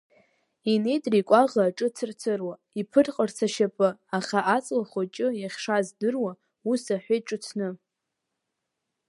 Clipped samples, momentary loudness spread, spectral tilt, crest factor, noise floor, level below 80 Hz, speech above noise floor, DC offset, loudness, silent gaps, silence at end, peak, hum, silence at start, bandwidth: under 0.1%; 11 LU; -5 dB/octave; 22 dB; -83 dBFS; -78 dBFS; 58 dB; under 0.1%; -26 LUFS; none; 1.35 s; -4 dBFS; none; 0.65 s; 11.5 kHz